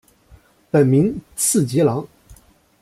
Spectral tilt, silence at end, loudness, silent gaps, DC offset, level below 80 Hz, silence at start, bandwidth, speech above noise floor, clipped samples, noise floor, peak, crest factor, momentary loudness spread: -6 dB/octave; 0.75 s; -18 LUFS; none; under 0.1%; -52 dBFS; 0.75 s; 16 kHz; 34 dB; under 0.1%; -51 dBFS; -4 dBFS; 16 dB; 9 LU